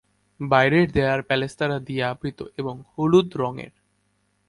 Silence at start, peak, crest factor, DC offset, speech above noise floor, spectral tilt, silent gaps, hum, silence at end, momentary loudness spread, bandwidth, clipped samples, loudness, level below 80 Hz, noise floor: 0.4 s; -4 dBFS; 20 dB; under 0.1%; 46 dB; -7 dB/octave; none; 50 Hz at -55 dBFS; 0.8 s; 14 LU; 11.5 kHz; under 0.1%; -22 LUFS; -50 dBFS; -68 dBFS